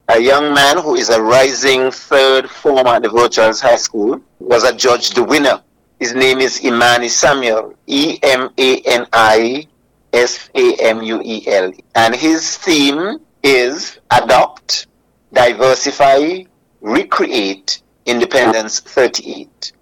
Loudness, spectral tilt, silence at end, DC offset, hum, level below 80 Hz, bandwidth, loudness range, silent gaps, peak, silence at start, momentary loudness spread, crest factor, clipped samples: -12 LUFS; -2.5 dB/octave; 0.1 s; under 0.1%; none; -50 dBFS; 17 kHz; 3 LU; none; -2 dBFS; 0.1 s; 9 LU; 10 dB; under 0.1%